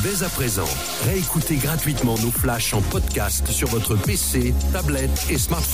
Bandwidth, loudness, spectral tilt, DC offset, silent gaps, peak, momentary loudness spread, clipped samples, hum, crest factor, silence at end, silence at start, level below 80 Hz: 16 kHz; -21 LUFS; -4 dB/octave; 0.7%; none; -8 dBFS; 2 LU; under 0.1%; none; 12 dB; 0 s; 0 s; -28 dBFS